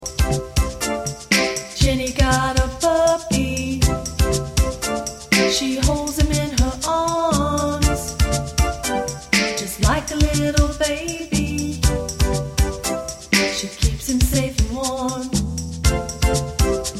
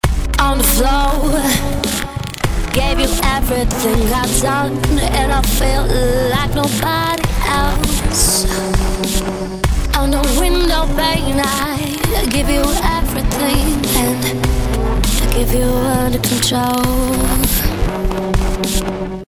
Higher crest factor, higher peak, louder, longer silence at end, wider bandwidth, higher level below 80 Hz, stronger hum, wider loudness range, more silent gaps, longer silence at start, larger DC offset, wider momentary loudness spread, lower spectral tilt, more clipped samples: about the same, 18 dB vs 14 dB; about the same, -2 dBFS vs 0 dBFS; second, -20 LUFS vs -16 LUFS; about the same, 0 s vs 0.05 s; about the same, 16 kHz vs 16 kHz; second, -24 dBFS vs -18 dBFS; neither; about the same, 2 LU vs 1 LU; neither; about the same, 0 s vs 0.05 s; neither; about the same, 5 LU vs 4 LU; about the same, -4 dB/octave vs -4 dB/octave; neither